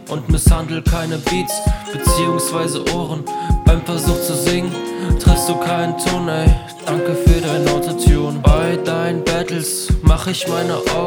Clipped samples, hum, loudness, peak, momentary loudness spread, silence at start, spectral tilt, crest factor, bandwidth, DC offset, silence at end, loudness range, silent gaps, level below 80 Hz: under 0.1%; none; -17 LUFS; 0 dBFS; 6 LU; 0 s; -5 dB/octave; 16 dB; 19.5 kHz; under 0.1%; 0 s; 2 LU; none; -20 dBFS